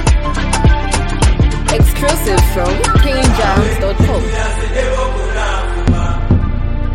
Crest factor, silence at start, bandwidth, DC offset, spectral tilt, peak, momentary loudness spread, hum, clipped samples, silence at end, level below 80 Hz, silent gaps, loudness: 12 dB; 0 s; 16.5 kHz; under 0.1%; -5.5 dB/octave; 0 dBFS; 5 LU; none; under 0.1%; 0 s; -14 dBFS; none; -14 LUFS